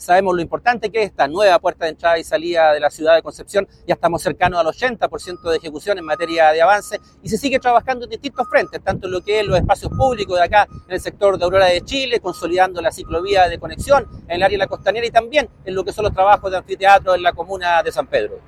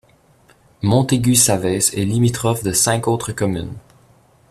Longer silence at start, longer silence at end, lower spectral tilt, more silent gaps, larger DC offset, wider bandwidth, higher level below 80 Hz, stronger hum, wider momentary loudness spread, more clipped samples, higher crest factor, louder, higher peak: second, 0 s vs 0.8 s; second, 0.1 s vs 0.7 s; about the same, -4.5 dB/octave vs -4.5 dB/octave; neither; neither; about the same, 14.5 kHz vs 15 kHz; first, -40 dBFS vs -46 dBFS; neither; about the same, 9 LU vs 9 LU; neither; about the same, 16 dB vs 18 dB; about the same, -17 LUFS vs -17 LUFS; about the same, 0 dBFS vs 0 dBFS